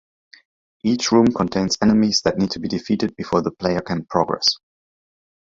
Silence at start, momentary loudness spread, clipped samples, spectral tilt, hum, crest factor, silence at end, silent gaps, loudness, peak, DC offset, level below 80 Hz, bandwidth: 0.85 s; 7 LU; under 0.1%; -4.5 dB/octave; none; 20 dB; 1 s; none; -20 LUFS; -2 dBFS; under 0.1%; -50 dBFS; 7.8 kHz